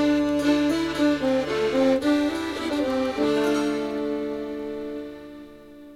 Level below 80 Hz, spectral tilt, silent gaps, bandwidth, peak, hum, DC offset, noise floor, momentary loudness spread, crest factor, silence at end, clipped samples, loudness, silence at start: -52 dBFS; -5 dB/octave; none; 14 kHz; -10 dBFS; 50 Hz at -60 dBFS; under 0.1%; -44 dBFS; 12 LU; 14 dB; 0 s; under 0.1%; -24 LUFS; 0 s